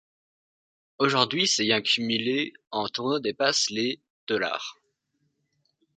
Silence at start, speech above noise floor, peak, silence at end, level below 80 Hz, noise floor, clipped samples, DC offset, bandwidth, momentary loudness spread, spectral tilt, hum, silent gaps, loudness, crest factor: 1 s; 49 dB; -2 dBFS; 1.25 s; -72 dBFS; -75 dBFS; under 0.1%; under 0.1%; 9.4 kHz; 9 LU; -2.5 dB/octave; none; 4.10-4.27 s; -25 LUFS; 26 dB